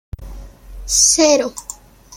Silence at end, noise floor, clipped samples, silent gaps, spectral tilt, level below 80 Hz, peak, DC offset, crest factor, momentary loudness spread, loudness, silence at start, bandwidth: 0 s; -34 dBFS; under 0.1%; none; -1.5 dB/octave; -36 dBFS; 0 dBFS; under 0.1%; 18 dB; 25 LU; -13 LUFS; 0.2 s; 16.5 kHz